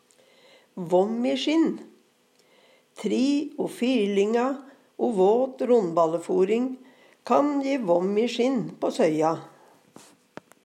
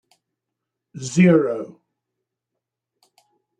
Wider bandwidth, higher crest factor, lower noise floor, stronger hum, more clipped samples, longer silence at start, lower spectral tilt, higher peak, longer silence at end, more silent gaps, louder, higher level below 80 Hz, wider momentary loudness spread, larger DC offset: first, 13 kHz vs 9.6 kHz; about the same, 18 dB vs 20 dB; second, -63 dBFS vs -83 dBFS; neither; neither; second, 0.75 s vs 0.95 s; about the same, -6 dB/octave vs -7 dB/octave; about the same, -6 dBFS vs -4 dBFS; second, 1.15 s vs 1.9 s; neither; second, -24 LUFS vs -18 LUFS; second, -86 dBFS vs -66 dBFS; second, 12 LU vs 19 LU; neither